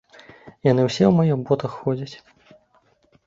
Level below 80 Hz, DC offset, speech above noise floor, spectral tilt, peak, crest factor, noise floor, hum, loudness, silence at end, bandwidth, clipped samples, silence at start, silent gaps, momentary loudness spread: -58 dBFS; under 0.1%; 42 dB; -7.5 dB/octave; -2 dBFS; 20 dB; -61 dBFS; none; -21 LUFS; 1.1 s; 7.8 kHz; under 0.1%; 0.45 s; none; 10 LU